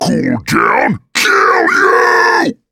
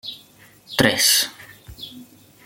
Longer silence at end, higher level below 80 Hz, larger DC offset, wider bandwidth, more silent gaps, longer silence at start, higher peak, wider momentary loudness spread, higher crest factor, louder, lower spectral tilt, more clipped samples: second, 0.2 s vs 0.45 s; about the same, -48 dBFS vs -50 dBFS; neither; about the same, 17.5 kHz vs 17 kHz; neither; about the same, 0 s vs 0.05 s; about the same, 0 dBFS vs -2 dBFS; second, 5 LU vs 22 LU; second, 12 dB vs 22 dB; first, -10 LUFS vs -17 LUFS; first, -4 dB/octave vs -1.5 dB/octave; neither